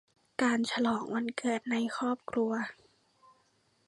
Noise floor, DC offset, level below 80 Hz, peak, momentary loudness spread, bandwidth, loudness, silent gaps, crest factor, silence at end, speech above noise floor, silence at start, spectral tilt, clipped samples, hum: -71 dBFS; under 0.1%; -74 dBFS; -16 dBFS; 6 LU; 11.5 kHz; -32 LUFS; none; 18 dB; 1.15 s; 40 dB; 0.4 s; -4 dB/octave; under 0.1%; none